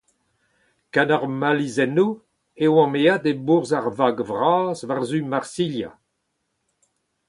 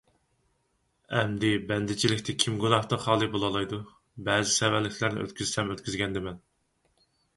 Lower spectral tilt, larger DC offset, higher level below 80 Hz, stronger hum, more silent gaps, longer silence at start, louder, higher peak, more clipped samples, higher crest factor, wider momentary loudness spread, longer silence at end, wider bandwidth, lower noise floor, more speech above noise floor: first, -6 dB/octave vs -4 dB/octave; neither; second, -66 dBFS vs -56 dBFS; neither; neither; second, 0.95 s vs 1.1 s; first, -21 LUFS vs -28 LUFS; about the same, -2 dBFS vs -4 dBFS; neither; second, 20 dB vs 26 dB; second, 8 LU vs 11 LU; first, 1.35 s vs 1 s; about the same, 11.5 kHz vs 11.5 kHz; about the same, -75 dBFS vs -73 dBFS; first, 54 dB vs 46 dB